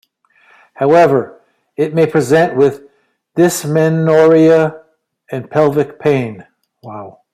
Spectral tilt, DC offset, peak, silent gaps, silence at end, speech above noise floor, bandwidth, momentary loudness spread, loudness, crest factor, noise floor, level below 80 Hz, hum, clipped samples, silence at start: -6.5 dB/octave; under 0.1%; -2 dBFS; none; 0.25 s; 44 dB; 15.5 kHz; 21 LU; -12 LUFS; 12 dB; -56 dBFS; -58 dBFS; none; under 0.1%; 0.8 s